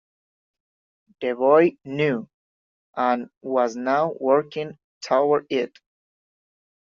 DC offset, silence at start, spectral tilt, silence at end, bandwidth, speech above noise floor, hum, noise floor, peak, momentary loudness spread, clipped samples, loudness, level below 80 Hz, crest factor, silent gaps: under 0.1%; 1.2 s; -4.5 dB/octave; 1.15 s; 7.4 kHz; over 69 dB; none; under -90 dBFS; -4 dBFS; 14 LU; under 0.1%; -22 LUFS; -72 dBFS; 20 dB; 2.34-2.93 s, 3.37-3.41 s, 4.84-5.01 s